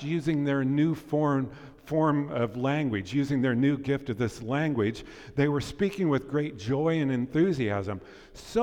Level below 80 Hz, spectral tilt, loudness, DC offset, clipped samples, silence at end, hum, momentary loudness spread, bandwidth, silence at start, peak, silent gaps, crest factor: -54 dBFS; -7.5 dB/octave; -28 LUFS; under 0.1%; under 0.1%; 0 s; none; 7 LU; 12.5 kHz; 0 s; -14 dBFS; none; 14 dB